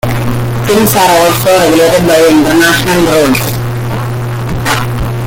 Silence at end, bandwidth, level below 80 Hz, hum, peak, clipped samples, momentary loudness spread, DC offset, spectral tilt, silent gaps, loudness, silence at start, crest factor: 0 s; 17.5 kHz; -28 dBFS; none; 0 dBFS; under 0.1%; 9 LU; under 0.1%; -4.5 dB/octave; none; -9 LUFS; 0.05 s; 8 dB